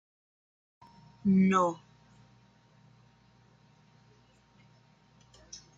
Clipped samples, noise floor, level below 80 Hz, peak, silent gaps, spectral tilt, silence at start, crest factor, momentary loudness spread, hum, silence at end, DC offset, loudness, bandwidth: under 0.1%; -63 dBFS; -70 dBFS; -14 dBFS; none; -7 dB/octave; 1.25 s; 22 dB; 25 LU; 60 Hz at -65 dBFS; 0.2 s; under 0.1%; -27 LUFS; 7.6 kHz